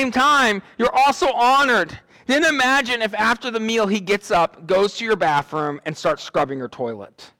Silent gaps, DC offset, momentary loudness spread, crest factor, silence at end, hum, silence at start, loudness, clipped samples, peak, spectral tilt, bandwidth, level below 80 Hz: none; under 0.1%; 11 LU; 10 dB; 0.15 s; none; 0 s; -19 LUFS; under 0.1%; -10 dBFS; -3.5 dB/octave; 18 kHz; -52 dBFS